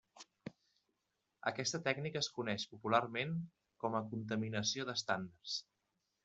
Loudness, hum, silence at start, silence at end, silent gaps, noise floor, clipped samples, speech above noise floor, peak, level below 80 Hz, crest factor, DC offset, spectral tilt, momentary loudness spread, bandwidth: -39 LUFS; none; 0.15 s; 0.65 s; none; -86 dBFS; under 0.1%; 47 dB; -16 dBFS; -80 dBFS; 24 dB; under 0.1%; -4 dB/octave; 18 LU; 8.2 kHz